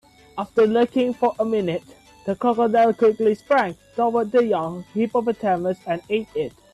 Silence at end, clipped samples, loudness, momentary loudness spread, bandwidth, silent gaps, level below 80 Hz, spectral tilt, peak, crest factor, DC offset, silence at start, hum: 0.25 s; under 0.1%; -21 LUFS; 11 LU; 12 kHz; none; -60 dBFS; -7 dB/octave; -8 dBFS; 14 dB; under 0.1%; 0.35 s; none